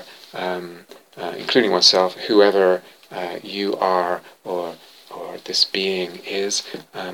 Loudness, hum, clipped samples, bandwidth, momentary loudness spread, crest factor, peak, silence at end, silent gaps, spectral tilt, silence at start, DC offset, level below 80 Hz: -19 LUFS; none; under 0.1%; 17 kHz; 19 LU; 20 dB; 0 dBFS; 0 s; none; -2.5 dB/octave; 0 s; under 0.1%; -76 dBFS